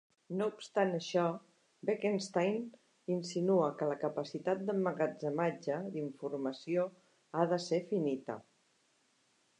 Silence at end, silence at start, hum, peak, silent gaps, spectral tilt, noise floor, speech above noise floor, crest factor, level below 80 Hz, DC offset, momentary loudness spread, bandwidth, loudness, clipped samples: 1.2 s; 0.3 s; none; -16 dBFS; none; -6 dB/octave; -74 dBFS; 39 dB; 20 dB; -88 dBFS; under 0.1%; 9 LU; 10 kHz; -36 LUFS; under 0.1%